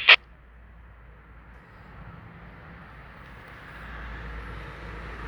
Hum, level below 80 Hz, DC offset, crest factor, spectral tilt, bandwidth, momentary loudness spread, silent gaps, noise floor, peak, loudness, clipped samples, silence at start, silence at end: none; -46 dBFS; under 0.1%; 28 dB; -3.5 dB/octave; over 20 kHz; 12 LU; none; -50 dBFS; -2 dBFS; -25 LUFS; under 0.1%; 0 s; 0 s